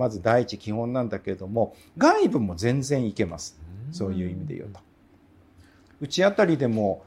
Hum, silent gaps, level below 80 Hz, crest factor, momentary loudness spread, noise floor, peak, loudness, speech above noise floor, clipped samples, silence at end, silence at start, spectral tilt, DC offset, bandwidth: none; none; -56 dBFS; 20 dB; 17 LU; -57 dBFS; -6 dBFS; -25 LUFS; 32 dB; under 0.1%; 0.05 s; 0 s; -6 dB/octave; under 0.1%; 14 kHz